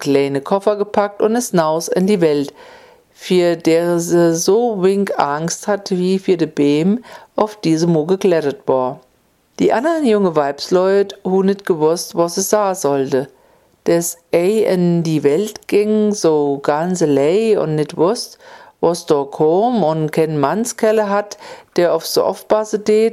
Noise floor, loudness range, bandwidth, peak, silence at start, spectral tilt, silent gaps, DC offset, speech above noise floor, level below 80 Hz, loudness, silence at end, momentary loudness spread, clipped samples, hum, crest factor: -58 dBFS; 2 LU; 15.5 kHz; 0 dBFS; 0 s; -5.5 dB/octave; none; under 0.1%; 42 dB; -62 dBFS; -16 LUFS; 0 s; 5 LU; under 0.1%; none; 16 dB